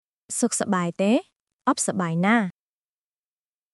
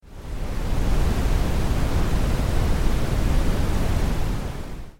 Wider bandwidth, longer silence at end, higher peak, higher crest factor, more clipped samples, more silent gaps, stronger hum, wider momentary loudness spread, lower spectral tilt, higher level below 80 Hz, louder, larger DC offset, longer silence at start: second, 12 kHz vs 16.5 kHz; first, 1.25 s vs 0.1 s; about the same, -6 dBFS vs -8 dBFS; first, 18 dB vs 12 dB; neither; first, 1.36-1.46 s, 1.53-1.59 s vs none; neither; about the same, 7 LU vs 7 LU; second, -4.5 dB/octave vs -6 dB/octave; second, -78 dBFS vs -24 dBFS; about the same, -24 LUFS vs -25 LUFS; neither; first, 0.3 s vs 0.1 s